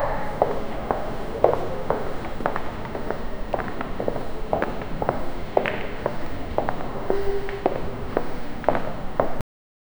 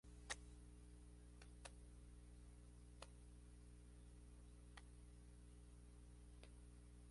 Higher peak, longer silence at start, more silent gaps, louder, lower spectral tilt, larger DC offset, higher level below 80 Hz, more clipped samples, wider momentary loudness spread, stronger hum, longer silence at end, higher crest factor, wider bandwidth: first, 0 dBFS vs -34 dBFS; about the same, 0 s vs 0.05 s; neither; first, -28 LUFS vs -63 LUFS; first, -7 dB/octave vs -3.5 dB/octave; first, 0.4% vs under 0.1%; first, -34 dBFS vs -64 dBFS; neither; about the same, 7 LU vs 8 LU; second, none vs 60 Hz at -65 dBFS; first, 0.6 s vs 0 s; about the same, 24 dB vs 28 dB; first, over 20 kHz vs 11.5 kHz